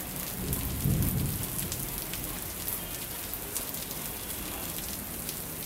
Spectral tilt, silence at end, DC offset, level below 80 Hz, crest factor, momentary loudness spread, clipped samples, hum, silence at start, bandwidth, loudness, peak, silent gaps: -3.5 dB/octave; 0 s; under 0.1%; -44 dBFS; 24 dB; 6 LU; under 0.1%; none; 0 s; 16.5 kHz; -33 LUFS; -10 dBFS; none